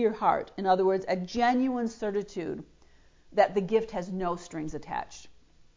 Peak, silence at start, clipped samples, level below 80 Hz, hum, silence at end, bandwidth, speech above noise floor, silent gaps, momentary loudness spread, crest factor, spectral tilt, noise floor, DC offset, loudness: -10 dBFS; 0 s; under 0.1%; -58 dBFS; none; 0.45 s; 7.6 kHz; 30 dB; none; 12 LU; 20 dB; -6 dB/octave; -58 dBFS; under 0.1%; -29 LUFS